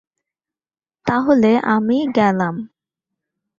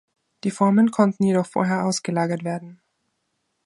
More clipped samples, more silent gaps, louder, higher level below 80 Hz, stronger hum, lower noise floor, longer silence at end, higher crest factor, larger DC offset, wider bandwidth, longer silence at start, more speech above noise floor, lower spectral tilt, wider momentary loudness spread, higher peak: neither; neither; first, -17 LUFS vs -21 LUFS; first, -60 dBFS vs -68 dBFS; neither; first, under -90 dBFS vs -74 dBFS; about the same, 0.95 s vs 0.9 s; about the same, 18 dB vs 18 dB; neither; second, 7.4 kHz vs 11.5 kHz; first, 1.05 s vs 0.45 s; first, over 74 dB vs 53 dB; first, -7.5 dB/octave vs -6 dB/octave; about the same, 10 LU vs 12 LU; about the same, -2 dBFS vs -4 dBFS